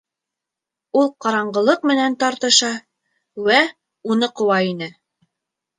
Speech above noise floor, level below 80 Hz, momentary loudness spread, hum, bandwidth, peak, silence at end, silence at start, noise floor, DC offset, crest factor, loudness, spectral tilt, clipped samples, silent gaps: 68 dB; -70 dBFS; 15 LU; none; 9.8 kHz; -2 dBFS; 0.9 s; 0.95 s; -85 dBFS; under 0.1%; 20 dB; -18 LUFS; -2.5 dB/octave; under 0.1%; none